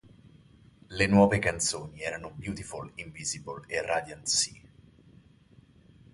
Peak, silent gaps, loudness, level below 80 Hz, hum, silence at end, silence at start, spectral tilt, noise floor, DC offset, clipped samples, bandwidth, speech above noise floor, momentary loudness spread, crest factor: -8 dBFS; none; -29 LUFS; -54 dBFS; none; 1.6 s; 0.25 s; -3.5 dB/octave; -58 dBFS; under 0.1%; under 0.1%; 11.5 kHz; 29 dB; 17 LU; 24 dB